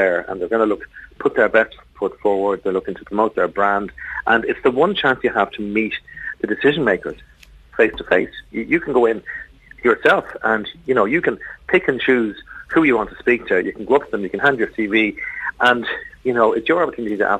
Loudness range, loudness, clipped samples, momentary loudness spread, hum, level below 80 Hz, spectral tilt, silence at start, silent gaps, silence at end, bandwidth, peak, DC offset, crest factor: 2 LU; -19 LUFS; under 0.1%; 10 LU; none; -50 dBFS; -6.5 dB/octave; 0 s; none; 0 s; 9 kHz; -4 dBFS; under 0.1%; 16 dB